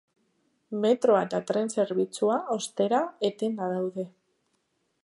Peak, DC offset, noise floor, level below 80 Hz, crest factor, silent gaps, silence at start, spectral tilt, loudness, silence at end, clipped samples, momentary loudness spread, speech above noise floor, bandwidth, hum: -10 dBFS; under 0.1%; -75 dBFS; -80 dBFS; 18 dB; none; 0.7 s; -5 dB/octave; -27 LUFS; 0.95 s; under 0.1%; 9 LU; 48 dB; 11.5 kHz; none